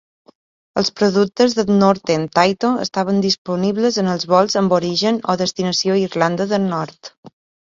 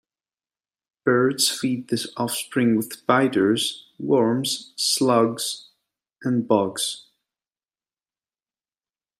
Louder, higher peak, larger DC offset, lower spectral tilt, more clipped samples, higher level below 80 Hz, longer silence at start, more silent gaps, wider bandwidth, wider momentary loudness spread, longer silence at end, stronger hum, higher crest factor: first, -17 LUFS vs -22 LUFS; first, 0 dBFS vs -4 dBFS; neither; about the same, -5 dB/octave vs -4 dB/octave; neither; first, -58 dBFS vs -70 dBFS; second, 0.75 s vs 1.05 s; first, 3.38-3.45 s, 7.17-7.23 s vs none; second, 7.6 kHz vs 16 kHz; second, 6 LU vs 9 LU; second, 0.5 s vs 2.2 s; neither; about the same, 18 dB vs 20 dB